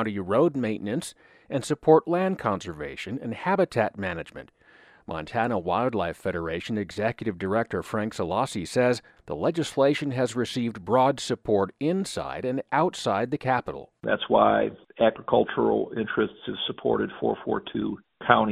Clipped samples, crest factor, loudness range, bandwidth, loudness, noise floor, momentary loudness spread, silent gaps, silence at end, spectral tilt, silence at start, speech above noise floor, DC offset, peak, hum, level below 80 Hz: under 0.1%; 24 dB; 4 LU; 14 kHz; -26 LUFS; -56 dBFS; 10 LU; none; 0 s; -5.5 dB/octave; 0 s; 30 dB; under 0.1%; -2 dBFS; none; -58 dBFS